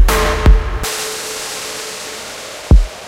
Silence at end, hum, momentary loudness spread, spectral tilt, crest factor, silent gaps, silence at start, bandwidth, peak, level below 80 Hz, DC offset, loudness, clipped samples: 0 s; none; 13 LU; -4 dB/octave; 14 dB; none; 0 s; 16.5 kHz; 0 dBFS; -16 dBFS; under 0.1%; -17 LUFS; under 0.1%